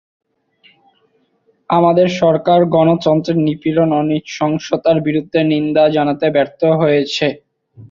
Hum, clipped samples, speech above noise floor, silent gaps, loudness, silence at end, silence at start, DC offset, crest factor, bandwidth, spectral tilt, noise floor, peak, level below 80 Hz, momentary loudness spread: none; under 0.1%; 46 dB; none; -14 LUFS; 0.05 s; 1.7 s; under 0.1%; 14 dB; 7.6 kHz; -7 dB/octave; -60 dBFS; -2 dBFS; -56 dBFS; 6 LU